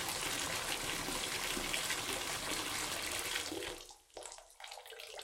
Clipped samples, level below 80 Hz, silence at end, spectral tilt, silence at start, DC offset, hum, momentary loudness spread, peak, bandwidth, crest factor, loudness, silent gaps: under 0.1%; -60 dBFS; 0 s; -1 dB/octave; 0 s; under 0.1%; none; 14 LU; -20 dBFS; 17 kHz; 22 dB; -37 LUFS; none